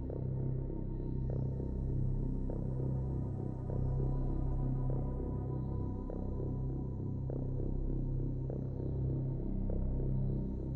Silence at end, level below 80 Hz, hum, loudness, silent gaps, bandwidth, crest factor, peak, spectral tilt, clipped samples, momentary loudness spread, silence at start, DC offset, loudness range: 0 s; -40 dBFS; none; -38 LUFS; none; 1.9 kHz; 12 dB; -24 dBFS; -12.5 dB/octave; under 0.1%; 3 LU; 0 s; under 0.1%; 2 LU